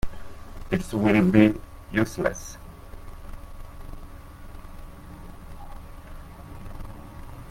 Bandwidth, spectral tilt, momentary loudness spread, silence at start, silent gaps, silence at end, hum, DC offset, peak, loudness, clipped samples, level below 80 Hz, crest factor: 16.5 kHz; -6.5 dB/octave; 25 LU; 0.05 s; none; 0 s; none; under 0.1%; -2 dBFS; -23 LUFS; under 0.1%; -40 dBFS; 26 dB